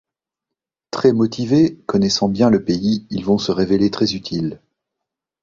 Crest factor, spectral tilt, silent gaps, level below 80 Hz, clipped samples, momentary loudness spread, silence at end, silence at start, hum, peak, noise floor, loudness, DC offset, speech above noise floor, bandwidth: 18 dB; -6 dB/octave; none; -50 dBFS; under 0.1%; 8 LU; 0.85 s; 0.95 s; none; -2 dBFS; -84 dBFS; -18 LUFS; under 0.1%; 67 dB; 7.6 kHz